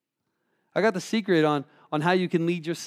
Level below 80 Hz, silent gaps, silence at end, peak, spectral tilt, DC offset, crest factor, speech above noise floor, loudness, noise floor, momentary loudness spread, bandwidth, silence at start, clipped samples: -84 dBFS; none; 0 s; -8 dBFS; -6 dB/octave; under 0.1%; 18 dB; 54 dB; -25 LUFS; -78 dBFS; 8 LU; 15 kHz; 0.75 s; under 0.1%